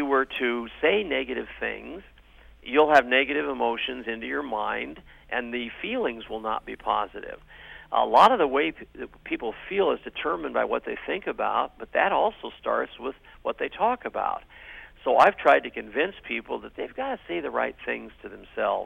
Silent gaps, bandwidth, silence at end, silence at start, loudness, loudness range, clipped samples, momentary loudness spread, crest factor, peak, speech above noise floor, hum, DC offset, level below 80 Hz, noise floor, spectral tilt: none; 13 kHz; 0 s; 0 s; -26 LUFS; 6 LU; under 0.1%; 18 LU; 20 dB; -6 dBFS; 26 dB; none; under 0.1%; -56 dBFS; -52 dBFS; -5 dB/octave